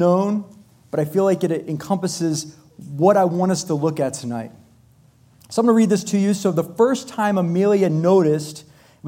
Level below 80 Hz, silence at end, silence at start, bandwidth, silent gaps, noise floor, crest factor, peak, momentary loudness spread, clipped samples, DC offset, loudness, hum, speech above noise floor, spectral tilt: -64 dBFS; 0 s; 0 s; 17 kHz; none; -53 dBFS; 18 dB; -2 dBFS; 12 LU; under 0.1%; under 0.1%; -19 LUFS; none; 34 dB; -6.5 dB/octave